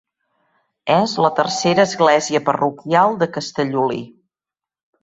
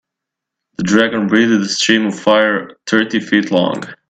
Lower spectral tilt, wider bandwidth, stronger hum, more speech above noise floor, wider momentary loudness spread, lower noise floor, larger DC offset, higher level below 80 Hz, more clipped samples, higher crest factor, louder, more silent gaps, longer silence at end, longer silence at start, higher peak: about the same, -4.5 dB/octave vs -4 dB/octave; second, 8 kHz vs 9.2 kHz; neither; first, 72 dB vs 67 dB; about the same, 7 LU vs 7 LU; first, -89 dBFS vs -81 dBFS; neither; second, -62 dBFS vs -56 dBFS; neither; about the same, 18 dB vs 16 dB; second, -17 LUFS vs -14 LUFS; neither; first, 0.95 s vs 0.15 s; about the same, 0.85 s vs 0.8 s; about the same, -2 dBFS vs 0 dBFS